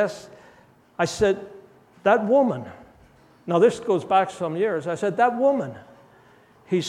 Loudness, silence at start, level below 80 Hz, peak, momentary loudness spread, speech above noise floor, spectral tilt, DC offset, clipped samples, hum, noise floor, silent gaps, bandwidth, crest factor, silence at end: -22 LUFS; 0 s; -58 dBFS; -4 dBFS; 17 LU; 33 dB; -5.5 dB/octave; under 0.1%; under 0.1%; none; -54 dBFS; none; 13 kHz; 20 dB; 0 s